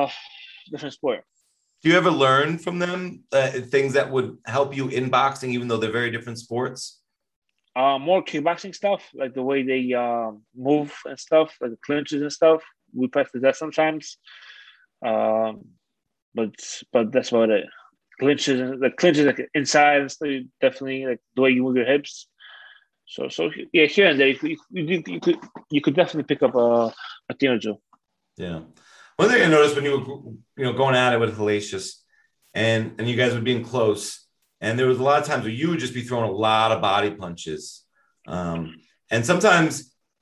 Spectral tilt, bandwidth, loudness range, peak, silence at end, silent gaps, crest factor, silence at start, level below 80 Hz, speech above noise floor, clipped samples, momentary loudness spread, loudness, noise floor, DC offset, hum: -5 dB/octave; 12.5 kHz; 4 LU; -2 dBFS; 0.4 s; 7.36-7.42 s, 16.22-16.32 s; 20 dB; 0 s; -62 dBFS; 47 dB; under 0.1%; 16 LU; -22 LUFS; -69 dBFS; under 0.1%; none